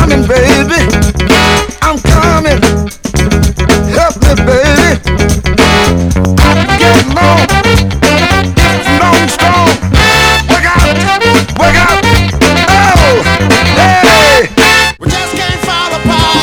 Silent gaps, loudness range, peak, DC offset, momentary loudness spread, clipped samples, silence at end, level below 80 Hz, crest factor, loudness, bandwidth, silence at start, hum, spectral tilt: none; 3 LU; 0 dBFS; under 0.1%; 5 LU; 3%; 0 s; -16 dBFS; 8 dB; -7 LUFS; over 20 kHz; 0 s; none; -4.5 dB/octave